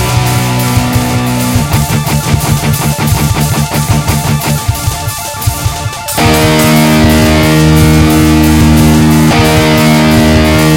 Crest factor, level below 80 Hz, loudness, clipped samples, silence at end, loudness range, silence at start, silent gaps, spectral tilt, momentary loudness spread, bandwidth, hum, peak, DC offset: 8 dB; -22 dBFS; -8 LUFS; 0.6%; 0 s; 5 LU; 0 s; none; -5 dB/octave; 7 LU; 17 kHz; none; 0 dBFS; under 0.1%